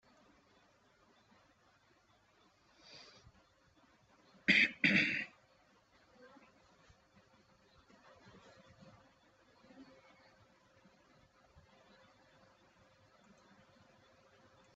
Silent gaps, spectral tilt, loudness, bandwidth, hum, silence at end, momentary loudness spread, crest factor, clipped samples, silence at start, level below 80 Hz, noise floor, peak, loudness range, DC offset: none; -1.5 dB/octave; -31 LUFS; 8 kHz; none; 4.9 s; 32 LU; 30 dB; under 0.1%; 2.95 s; -78 dBFS; -71 dBFS; -14 dBFS; 7 LU; under 0.1%